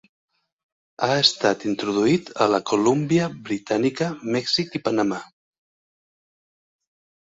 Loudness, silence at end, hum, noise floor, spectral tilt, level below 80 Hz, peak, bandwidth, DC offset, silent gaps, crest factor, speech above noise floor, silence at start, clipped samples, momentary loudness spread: -22 LUFS; 2 s; none; under -90 dBFS; -4.5 dB/octave; -62 dBFS; -4 dBFS; 8 kHz; under 0.1%; none; 20 dB; over 68 dB; 1 s; under 0.1%; 9 LU